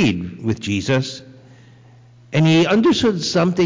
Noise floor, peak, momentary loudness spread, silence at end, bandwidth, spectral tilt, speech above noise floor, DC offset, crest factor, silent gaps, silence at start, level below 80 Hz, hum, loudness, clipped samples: -46 dBFS; -8 dBFS; 11 LU; 0 s; 7.6 kHz; -6 dB/octave; 30 dB; under 0.1%; 10 dB; none; 0 s; -46 dBFS; none; -18 LUFS; under 0.1%